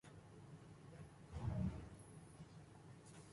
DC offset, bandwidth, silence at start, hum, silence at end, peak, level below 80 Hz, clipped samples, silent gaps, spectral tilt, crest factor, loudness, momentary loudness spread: under 0.1%; 11.5 kHz; 0.05 s; none; 0 s; -32 dBFS; -60 dBFS; under 0.1%; none; -7 dB/octave; 18 dB; -53 LUFS; 16 LU